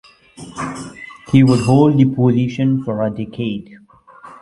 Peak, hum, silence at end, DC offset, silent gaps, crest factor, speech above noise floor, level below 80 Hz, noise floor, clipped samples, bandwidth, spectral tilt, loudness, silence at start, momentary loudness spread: 0 dBFS; none; 0.05 s; under 0.1%; none; 16 dB; 27 dB; -50 dBFS; -42 dBFS; under 0.1%; 11.5 kHz; -8 dB/octave; -16 LUFS; 0.4 s; 18 LU